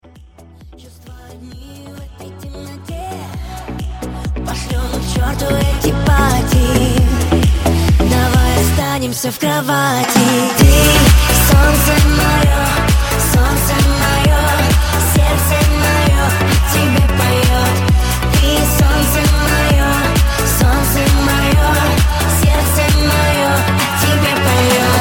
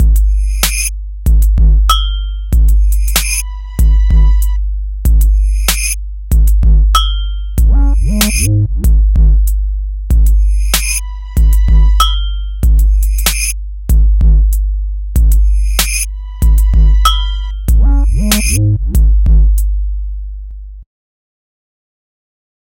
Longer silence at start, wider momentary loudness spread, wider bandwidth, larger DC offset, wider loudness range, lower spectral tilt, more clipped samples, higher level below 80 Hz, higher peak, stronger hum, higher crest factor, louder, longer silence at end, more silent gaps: first, 0.6 s vs 0 s; first, 14 LU vs 9 LU; about the same, 18 kHz vs 17 kHz; neither; first, 13 LU vs 2 LU; about the same, -4.5 dB/octave vs -4 dB/octave; neither; second, -18 dBFS vs -10 dBFS; about the same, 0 dBFS vs 0 dBFS; neither; about the same, 12 dB vs 10 dB; about the same, -13 LUFS vs -13 LUFS; second, 0 s vs 1.9 s; neither